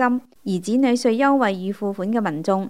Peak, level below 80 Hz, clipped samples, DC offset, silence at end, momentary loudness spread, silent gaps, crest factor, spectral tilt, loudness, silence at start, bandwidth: -6 dBFS; -72 dBFS; under 0.1%; 0.3%; 0 s; 9 LU; none; 16 dB; -6 dB/octave; -21 LUFS; 0 s; 13 kHz